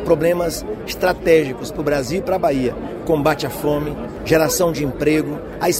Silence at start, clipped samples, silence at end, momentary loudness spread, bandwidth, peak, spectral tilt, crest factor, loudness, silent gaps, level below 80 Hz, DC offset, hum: 0 s; under 0.1%; 0 s; 10 LU; 16 kHz; -2 dBFS; -5 dB/octave; 16 dB; -19 LUFS; none; -38 dBFS; under 0.1%; none